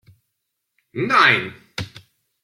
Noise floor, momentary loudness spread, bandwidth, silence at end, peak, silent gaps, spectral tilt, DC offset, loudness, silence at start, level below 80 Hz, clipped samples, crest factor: -77 dBFS; 20 LU; 15.5 kHz; 0.55 s; -2 dBFS; none; -4 dB/octave; under 0.1%; -16 LUFS; 0.95 s; -58 dBFS; under 0.1%; 20 dB